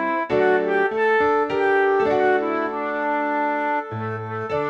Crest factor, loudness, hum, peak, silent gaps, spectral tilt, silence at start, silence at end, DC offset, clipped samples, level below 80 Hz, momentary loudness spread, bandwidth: 14 dB; -21 LUFS; none; -8 dBFS; none; -7 dB/octave; 0 s; 0 s; under 0.1%; under 0.1%; -58 dBFS; 8 LU; 7.2 kHz